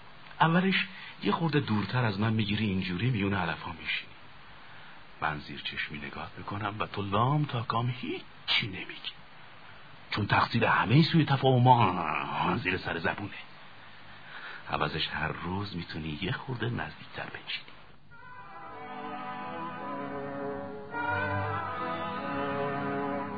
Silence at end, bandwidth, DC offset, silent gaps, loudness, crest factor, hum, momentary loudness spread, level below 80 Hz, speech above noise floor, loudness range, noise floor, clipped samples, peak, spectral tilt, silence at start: 0 s; 5 kHz; 0.3%; none; -30 LUFS; 24 dB; none; 23 LU; -58 dBFS; 25 dB; 12 LU; -54 dBFS; under 0.1%; -8 dBFS; -8 dB/octave; 0 s